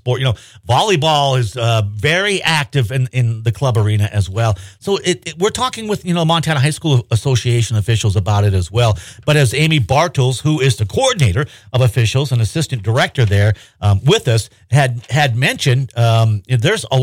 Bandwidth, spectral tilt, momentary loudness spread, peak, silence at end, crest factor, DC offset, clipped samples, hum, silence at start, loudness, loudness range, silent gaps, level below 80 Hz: 16 kHz; -5 dB/octave; 5 LU; -4 dBFS; 0 s; 12 dB; under 0.1%; under 0.1%; none; 0.05 s; -15 LUFS; 2 LU; none; -42 dBFS